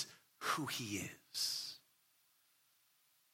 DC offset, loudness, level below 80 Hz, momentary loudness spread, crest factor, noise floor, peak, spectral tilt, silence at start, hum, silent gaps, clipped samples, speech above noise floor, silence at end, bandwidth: under 0.1%; -41 LUFS; -84 dBFS; 9 LU; 22 dB; -75 dBFS; -24 dBFS; -2 dB/octave; 0 s; none; none; under 0.1%; 32 dB; 1.55 s; 16.5 kHz